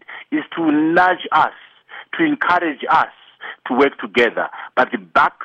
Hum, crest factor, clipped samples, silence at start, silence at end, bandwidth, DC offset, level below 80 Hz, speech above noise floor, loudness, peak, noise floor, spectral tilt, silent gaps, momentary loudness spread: none; 16 dB; under 0.1%; 0.1 s; 0 s; 8.2 kHz; under 0.1%; -58 dBFS; 19 dB; -17 LUFS; -2 dBFS; -36 dBFS; -6 dB/octave; none; 15 LU